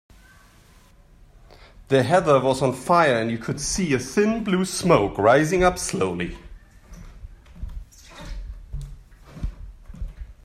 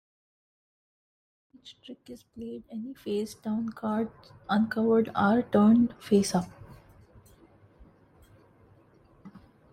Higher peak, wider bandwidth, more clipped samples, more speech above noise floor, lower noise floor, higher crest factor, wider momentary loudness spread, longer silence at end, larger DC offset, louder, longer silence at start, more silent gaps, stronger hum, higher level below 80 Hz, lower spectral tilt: first, -4 dBFS vs -12 dBFS; about the same, 15 kHz vs 14.5 kHz; neither; about the same, 32 dB vs 32 dB; second, -52 dBFS vs -60 dBFS; about the same, 20 dB vs 18 dB; second, 22 LU vs 25 LU; second, 0.1 s vs 0.35 s; neither; first, -21 LUFS vs -27 LUFS; first, 1.8 s vs 1.65 s; neither; neither; first, -40 dBFS vs -62 dBFS; second, -5 dB/octave vs -6.5 dB/octave